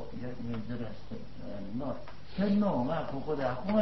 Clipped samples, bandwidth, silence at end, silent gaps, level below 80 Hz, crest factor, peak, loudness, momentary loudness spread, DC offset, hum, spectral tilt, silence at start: under 0.1%; 6 kHz; 0 s; none; -54 dBFS; 16 dB; -16 dBFS; -34 LUFS; 15 LU; 1%; none; -9 dB/octave; 0 s